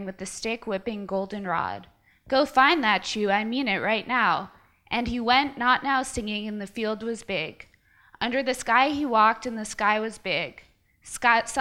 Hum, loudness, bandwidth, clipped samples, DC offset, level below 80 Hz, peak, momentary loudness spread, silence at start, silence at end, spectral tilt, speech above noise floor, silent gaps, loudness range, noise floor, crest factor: none; -25 LUFS; 16 kHz; under 0.1%; under 0.1%; -54 dBFS; -6 dBFS; 11 LU; 0 s; 0 s; -3.5 dB/octave; 32 dB; none; 3 LU; -57 dBFS; 20 dB